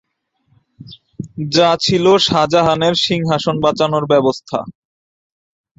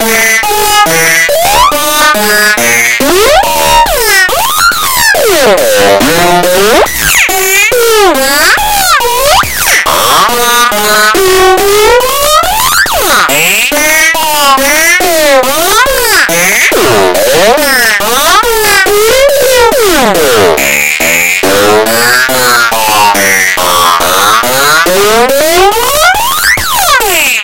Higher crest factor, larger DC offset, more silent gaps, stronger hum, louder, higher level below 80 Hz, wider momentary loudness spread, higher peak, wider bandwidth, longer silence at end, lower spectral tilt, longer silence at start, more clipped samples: first, 16 dB vs 6 dB; second, under 0.1% vs 6%; neither; neither; second, -14 LUFS vs -5 LUFS; second, -50 dBFS vs -28 dBFS; first, 13 LU vs 1 LU; about the same, 0 dBFS vs 0 dBFS; second, 8 kHz vs over 20 kHz; first, 1.05 s vs 0 s; first, -5 dB/octave vs -1.5 dB/octave; first, 0.8 s vs 0 s; second, under 0.1% vs 3%